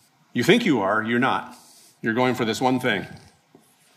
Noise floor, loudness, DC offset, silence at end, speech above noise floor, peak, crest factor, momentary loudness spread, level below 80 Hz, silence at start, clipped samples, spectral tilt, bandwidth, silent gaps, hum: -57 dBFS; -22 LUFS; under 0.1%; 0.8 s; 35 dB; -4 dBFS; 20 dB; 12 LU; -66 dBFS; 0.35 s; under 0.1%; -5 dB/octave; 15 kHz; none; none